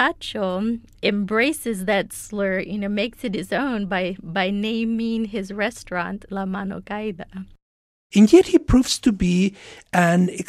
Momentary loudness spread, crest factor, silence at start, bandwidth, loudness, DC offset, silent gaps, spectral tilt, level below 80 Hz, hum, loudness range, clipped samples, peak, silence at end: 12 LU; 20 dB; 0 s; 15 kHz; -21 LUFS; under 0.1%; 7.62-8.10 s; -5.5 dB/octave; -40 dBFS; none; 7 LU; under 0.1%; 0 dBFS; 0.05 s